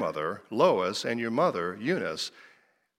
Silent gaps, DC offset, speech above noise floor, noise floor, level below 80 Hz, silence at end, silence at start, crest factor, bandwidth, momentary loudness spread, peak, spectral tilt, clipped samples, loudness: none; under 0.1%; 36 dB; -64 dBFS; -74 dBFS; 0.55 s; 0 s; 20 dB; 15 kHz; 9 LU; -10 dBFS; -5 dB/octave; under 0.1%; -28 LUFS